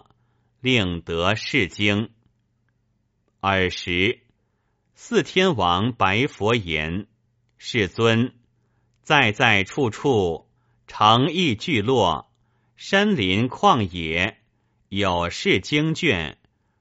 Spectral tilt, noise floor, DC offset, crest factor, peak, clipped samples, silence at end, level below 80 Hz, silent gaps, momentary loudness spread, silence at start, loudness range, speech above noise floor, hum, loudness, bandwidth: -3 dB/octave; -69 dBFS; under 0.1%; 22 dB; 0 dBFS; under 0.1%; 0.5 s; -50 dBFS; none; 10 LU; 0.65 s; 4 LU; 48 dB; none; -21 LUFS; 8 kHz